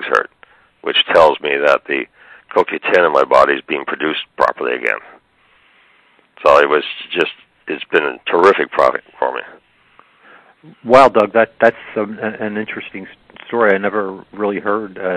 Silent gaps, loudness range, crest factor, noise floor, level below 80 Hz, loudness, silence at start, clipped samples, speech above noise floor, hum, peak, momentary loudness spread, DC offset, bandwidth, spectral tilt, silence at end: none; 4 LU; 16 dB; -54 dBFS; -54 dBFS; -15 LUFS; 0 s; 0.2%; 39 dB; none; 0 dBFS; 15 LU; under 0.1%; 11 kHz; -5 dB/octave; 0 s